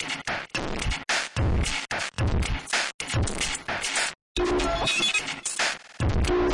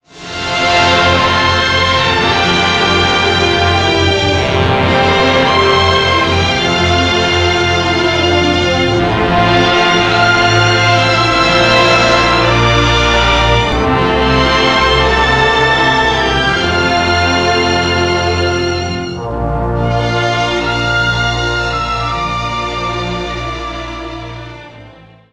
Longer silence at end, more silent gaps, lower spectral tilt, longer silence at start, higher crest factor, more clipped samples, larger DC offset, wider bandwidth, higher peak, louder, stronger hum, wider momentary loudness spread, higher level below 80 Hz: second, 0 s vs 0.4 s; first, 2.94-2.99 s, 4.22-4.35 s vs none; about the same, -3.5 dB/octave vs -4.5 dB/octave; second, 0 s vs 0.15 s; about the same, 14 dB vs 12 dB; neither; neither; about the same, 11.5 kHz vs 11.5 kHz; second, -12 dBFS vs 0 dBFS; second, -26 LUFS vs -11 LUFS; neither; about the same, 6 LU vs 8 LU; second, -34 dBFS vs -26 dBFS